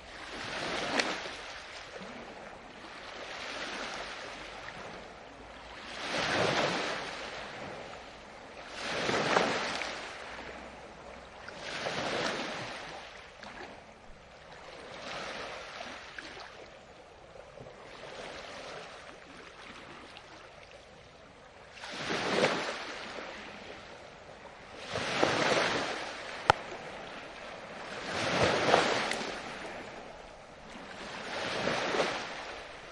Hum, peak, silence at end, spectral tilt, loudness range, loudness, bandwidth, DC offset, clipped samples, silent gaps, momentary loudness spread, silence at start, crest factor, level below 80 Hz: none; -6 dBFS; 0 s; -3 dB/octave; 14 LU; -34 LUFS; 11.5 kHz; under 0.1%; under 0.1%; none; 20 LU; 0 s; 30 dB; -62 dBFS